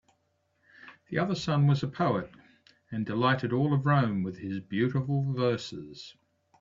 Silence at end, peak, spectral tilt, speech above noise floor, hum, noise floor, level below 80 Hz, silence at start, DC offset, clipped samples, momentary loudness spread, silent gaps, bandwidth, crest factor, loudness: 0.5 s; -12 dBFS; -7.5 dB/octave; 46 dB; none; -74 dBFS; -64 dBFS; 0.85 s; under 0.1%; under 0.1%; 15 LU; none; 7.4 kHz; 18 dB; -29 LUFS